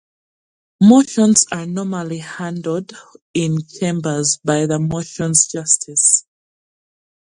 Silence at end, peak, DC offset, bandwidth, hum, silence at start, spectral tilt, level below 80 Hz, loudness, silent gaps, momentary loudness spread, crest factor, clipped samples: 1.2 s; 0 dBFS; under 0.1%; 11.5 kHz; none; 0.8 s; -4 dB/octave; -56 dBFS; -16 LUFS; 3.21-3.34 s; 13 LU; 18 dB; under 0.1%